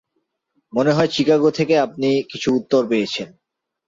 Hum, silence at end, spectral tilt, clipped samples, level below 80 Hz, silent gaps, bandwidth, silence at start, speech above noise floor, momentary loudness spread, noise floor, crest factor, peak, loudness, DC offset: none; 0.6 s; -5.5 dB/octave; under 0.1%; -60 dBFS; none; 7.8 kHz; 0.75 s; 55 dB; 9 LU; -73 dBFS; 14 dB; -4 dBFS; -19 LUFS; under 0.1%